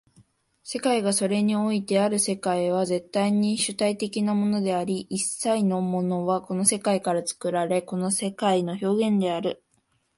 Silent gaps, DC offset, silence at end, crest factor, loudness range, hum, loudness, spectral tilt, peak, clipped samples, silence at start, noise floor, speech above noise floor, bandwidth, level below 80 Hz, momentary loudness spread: none; under 0.1%; 0.6 s; 20 dB; 1 LU; none; -25 LUFS; -4.5 dB/octave; -4 dBFS; under 0.1%; 0.65 s; -69 dBFS; 45 dB; 11.5 kHz; -68 dBFS; 5 LU